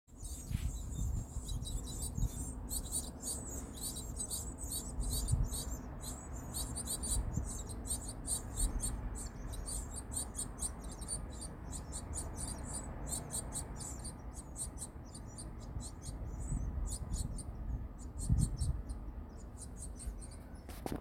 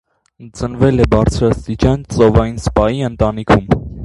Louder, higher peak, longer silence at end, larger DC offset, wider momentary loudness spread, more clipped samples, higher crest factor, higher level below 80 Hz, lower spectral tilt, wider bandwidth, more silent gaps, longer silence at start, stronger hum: second, -41 LUFS vs -14 LUFS; second, -18 dBFS vs 0 dBFS; about the same, 0 s vs 0 s; neither; first, 10 LU vs 6 LU; neither; first, 22 dB vs 14 dB; second, -44 dBFS vs -26 dBFS; second, -4 dB/octave vs -7.5 dB/octave; first, 17 kHz vs 11.5 kHz; neither; second, 0.1 s vs 0.4 s; neither